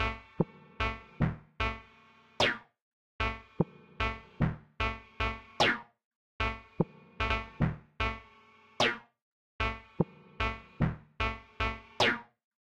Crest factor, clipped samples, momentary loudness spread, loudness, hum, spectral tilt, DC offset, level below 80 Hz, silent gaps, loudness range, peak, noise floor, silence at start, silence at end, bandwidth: 22 dB; under 0.1%; 7 LU; -33 LUFS; none; -5 dB/octave; under 0.1%; -44 dBFS; 2.82-3.19 s, 6.05-6.39 s, 9.22-9.59 s; 2 LU; -12 dBFS; -60 dBFS; 0 s; 0.55 s; 12 kHz